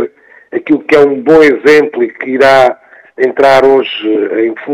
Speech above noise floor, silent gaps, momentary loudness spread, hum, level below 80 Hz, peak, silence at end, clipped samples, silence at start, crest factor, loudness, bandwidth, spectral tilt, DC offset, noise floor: 22 dB; none; 10 LU; none; -48 dBFS; 0 dBFS; 0 s; 1%; 0 s; 8 dB; -8 LUFS; 12.5 kHz; -5 dB/octave; under 0.1%; -30 dBFS